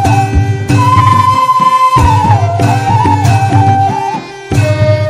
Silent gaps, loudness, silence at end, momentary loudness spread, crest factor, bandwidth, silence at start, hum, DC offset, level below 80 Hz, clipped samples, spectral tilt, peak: none; -9 LUFS; 0 s; 6 LU; 8 dB; 14 kHz; 0 s; none; under 0.1%; -24 dBFS; 1%; -6.5 dB/octave; 0 dBFS